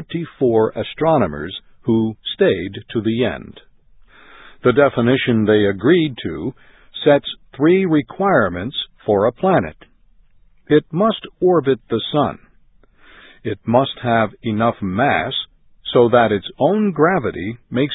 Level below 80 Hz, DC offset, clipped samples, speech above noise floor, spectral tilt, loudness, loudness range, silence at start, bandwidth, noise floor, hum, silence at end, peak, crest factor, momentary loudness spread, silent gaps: -48 dBFS; under 0.1%; under 0.1%; 34 dB; -11.5 dB/octave; -18 LUFS; 3 LU; 0 s; 4 kHz; -51 dBFS; none; 0 s; 0 dBFS; 18 dB; 12 LU; none